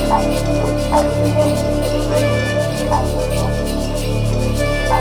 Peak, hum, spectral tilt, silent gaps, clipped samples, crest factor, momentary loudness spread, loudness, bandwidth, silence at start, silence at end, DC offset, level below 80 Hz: 0 dBFS; none; -6 dB/octave; none; under 0.1%; 16 dB; 4 LU; -17 LUFS; over 20 kHz; 0 s; 0 s; under 0.1%; -24 dBFS